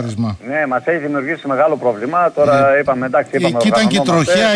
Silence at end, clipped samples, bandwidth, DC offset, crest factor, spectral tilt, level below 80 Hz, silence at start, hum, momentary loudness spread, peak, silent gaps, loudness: 0 s; under 0.1%; 10.5 kHz; under 0.1%; 12 dB; -5 dB/octave; -52 dBFS; 0 s; none; 7 LU; -2 dBFS; none; -15 LUFS